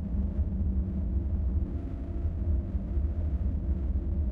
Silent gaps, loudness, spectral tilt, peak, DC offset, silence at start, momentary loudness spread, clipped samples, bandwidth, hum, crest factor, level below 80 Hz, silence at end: none; -32 LUFS; -12 dB/octave; -18 dBFS; under 0.1%; 0 s; 3 LU; under 0.1%; 2.4 kHz; none; 10 dB; -30 dBFS; 0 s